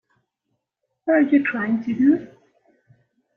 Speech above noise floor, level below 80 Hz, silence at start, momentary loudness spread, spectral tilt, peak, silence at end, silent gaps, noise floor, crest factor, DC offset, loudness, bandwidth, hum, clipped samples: 59 dB; -68 dBFS; 1.05 s; 7 LU; -9 dB/octave; -6 dBFS; 1.1 s; none; -78 dBFS; 16 dB; under 0.1%; -20 LUFS; 3.9 kHz; none; under 0.1%